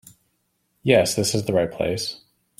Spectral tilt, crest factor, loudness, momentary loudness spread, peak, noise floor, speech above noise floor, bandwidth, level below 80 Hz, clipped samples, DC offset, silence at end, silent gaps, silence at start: -4.5 dB/octave; 20 dB; -22 LUFS; 11 LU; -2 dBFS; -71 dBFS; 50 dB; 16 kHz; -54 dBFS; under 0.1%; under 0.1%; 0.45 s; none; 0.85 s